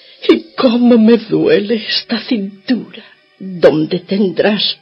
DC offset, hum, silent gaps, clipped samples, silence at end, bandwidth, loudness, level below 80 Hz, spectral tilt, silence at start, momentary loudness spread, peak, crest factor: under 0.1%; none; none; 0.1%; 0.05 s; 5.8 kHz; -13 LUFS; -58 dBFS; -7.5 dB/octave; 0.2 s; 10 LU; 0 dBFS; 14 dB